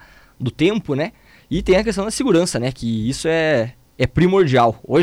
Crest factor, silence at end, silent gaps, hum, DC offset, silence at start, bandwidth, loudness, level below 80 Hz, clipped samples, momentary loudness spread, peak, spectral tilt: 12 dB; 0 s; none; none; under 0.1%; 0.4 s; 14.5 kHz; -18 LUFS; -38 dBFS; under 0.1%; 10 LU; -6 dBFS; -5.5 dB/octave